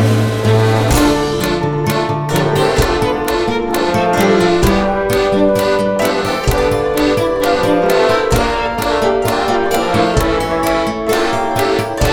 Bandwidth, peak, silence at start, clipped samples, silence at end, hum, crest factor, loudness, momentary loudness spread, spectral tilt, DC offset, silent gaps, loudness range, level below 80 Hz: 19 kHz; 0 dBFS; 0 s; under 0.1%; 0 s; none; 14 dB; -14 LUFS; 4 LU; -5.5 dB/octave; under 0.1%; none; 1 LU; -28 dBFS